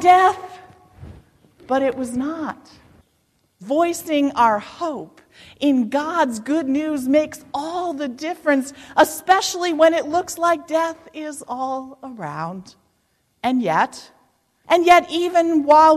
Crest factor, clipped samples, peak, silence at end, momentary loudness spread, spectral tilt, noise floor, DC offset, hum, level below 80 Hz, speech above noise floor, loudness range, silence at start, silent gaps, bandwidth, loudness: 16 dB; under 0.1%; -4 dBFS; 0 s; 16 LU; -4 dB/octave; -66 dBFS; under 0.1%; none; -58 dBFS; 47 dB; 6 LU; 0 s; none; 14.5 kHz; -19 LUFS